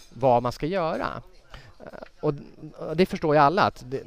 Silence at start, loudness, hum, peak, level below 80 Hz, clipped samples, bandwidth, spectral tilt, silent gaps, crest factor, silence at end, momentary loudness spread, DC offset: 0.15 s; -24 LUFS; none; -6 dBFS; -50 dBFS; under 0.1%; 15.5 kHz; -7 dB/octave; none; 20 dB; 0 s; 24 LU; 0.2%